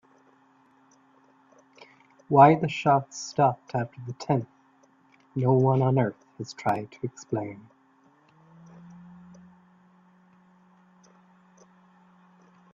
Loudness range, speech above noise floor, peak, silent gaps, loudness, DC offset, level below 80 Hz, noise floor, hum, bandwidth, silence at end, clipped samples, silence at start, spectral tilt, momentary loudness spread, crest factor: 12 LU; 37 dB; -4 dBFS; none; -25 LUFS; under 0.1%; -68 dBFS; -61 dBFS; none; 7.6 kHz; 5.2 s; under 0.1%; 2.3 s; -7 dB/octave; 22 LU; 24 dB